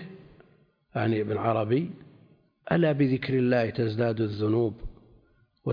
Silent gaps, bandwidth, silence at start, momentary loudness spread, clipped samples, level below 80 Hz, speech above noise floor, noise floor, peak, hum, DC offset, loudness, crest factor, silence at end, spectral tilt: none; 5.2 kHz; 0 s; 20 LU; under 0.1%; -52 dBFS; 37 dB; -63 dBFS; -10 dBFS; none; under 0.1%; -27 LUFS; 18 dB; 0 s; -10 dB/octave